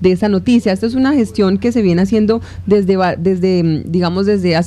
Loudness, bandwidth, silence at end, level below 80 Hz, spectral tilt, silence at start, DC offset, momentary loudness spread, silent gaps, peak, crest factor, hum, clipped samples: -14 LUFS; 11.5 kHz; 0 s; -40 dBFS; -7.5 dB/octave; 0 s; under 0.1%; 3 LU; none; -2 dBFS; 12 dB; none; under 0.1%